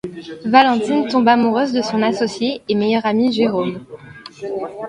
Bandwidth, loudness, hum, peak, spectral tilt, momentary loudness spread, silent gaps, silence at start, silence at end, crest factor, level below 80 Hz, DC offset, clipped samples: 10.5 kHz; -17 LUFS; none; 0 dBFS; -5.5 dB/octave; 18 LU; none; 0.05 s; 0 s; 18 dB; -58 dBFS; under 0.1%; under 0.1%